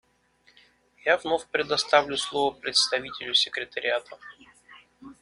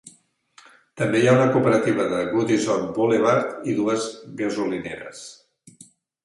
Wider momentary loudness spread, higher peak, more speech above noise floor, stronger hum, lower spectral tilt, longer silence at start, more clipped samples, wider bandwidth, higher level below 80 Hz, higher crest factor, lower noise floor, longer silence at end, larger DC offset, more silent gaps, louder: second, 8 LU vs 15 LU; about the same, -4 dBFS vs -4 dBFS; about the same, 37 dB vs 36 dB; neither; second, -1 dB/octave vs -6 dB/octave; first, 1.05 s vs 0.05 s; neither; about the same, 11.5 kHz vs 11.5 kHz; about the same, -66 dBFS vs -62 dBFS; first, 24 dB vs 18 dB; first, -64 dBFS vs -57 dBFS; second, 0.1 s vs 0.9 s; neither; neither; second, -25 LUFS vs -21 LUFS